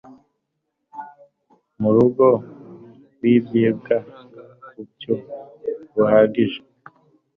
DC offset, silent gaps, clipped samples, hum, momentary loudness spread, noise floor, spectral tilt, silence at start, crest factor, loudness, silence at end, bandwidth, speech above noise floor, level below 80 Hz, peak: under 0.1%; none; under 0.1%; none; 24 LU; -76 dBFS; -10 dB/octave; 0.95 s; 18 dB; -19 LUFS; 0.8 s; 4 kHz; 59 dB; -60 dBFS; -4 dBFS